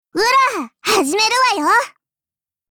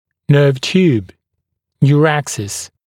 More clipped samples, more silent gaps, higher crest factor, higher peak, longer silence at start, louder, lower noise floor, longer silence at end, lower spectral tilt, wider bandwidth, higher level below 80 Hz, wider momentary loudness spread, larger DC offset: neither; neither; about the same, 12 dB vs 14 dB; second, -4 dBFS vs 0 dBFS; second, 0.15 s vs 0.3 s; about the same, -15 LUFS vs -14 LUFS; first, -90 dBFS vs -74 dBFS; first, 0.8 s vs 0.2 s; second, -0.5 dB/octave vs -6 dB/octave; first, over 20 kHz vs 13.5 kHz; second, -60 dBFS vs -54 dBFS; second, 6 LU vs 10 LU; neither